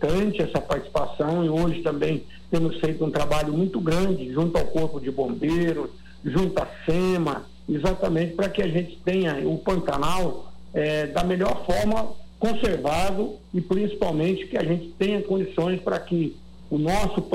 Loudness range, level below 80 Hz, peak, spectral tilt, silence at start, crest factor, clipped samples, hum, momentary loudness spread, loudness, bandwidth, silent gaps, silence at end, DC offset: 1 LU; -38 dBFS; -10 dBFS; -6.5 dB/octave; 0 s; 14 dB; under 0.1%; none; 5 LU; -25 LUFS; 15.5 kHz; none; 0 s; under 0.1%